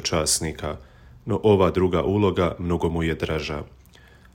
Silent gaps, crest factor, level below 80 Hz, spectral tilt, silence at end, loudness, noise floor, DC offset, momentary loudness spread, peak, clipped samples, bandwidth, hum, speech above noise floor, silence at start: none; 18 dB; -40 dBFS; -5 dB/octave; 0.7 s; -23 LUFS; -50 dBFS; under 0.1%; 15 LU; -6 dBFS; under 0.1%; 16 kHz; none; 28 dB; 0 s